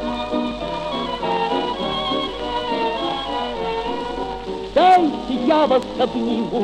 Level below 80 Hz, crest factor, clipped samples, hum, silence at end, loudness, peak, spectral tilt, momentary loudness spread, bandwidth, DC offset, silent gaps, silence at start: -42 dBFS; 16 dB; under 0.1%; none; 0 s; -21 LUFS; -4 dBFS; -5.5 dB/octave; 9 LU; 11 kHz; under 0.1%; none; 0 s